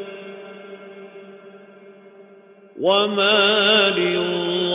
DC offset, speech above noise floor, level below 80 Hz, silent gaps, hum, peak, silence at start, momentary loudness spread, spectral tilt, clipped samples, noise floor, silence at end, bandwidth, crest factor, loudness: under 0.1%; 30 dB; -66 dBFS; none; none; -4 dBFS; 0 s; 25 LU; -8 dB/octave; under 0.1%; -48 dBFS; 0 s; 4 kHz; 18 dB; -17 LUFS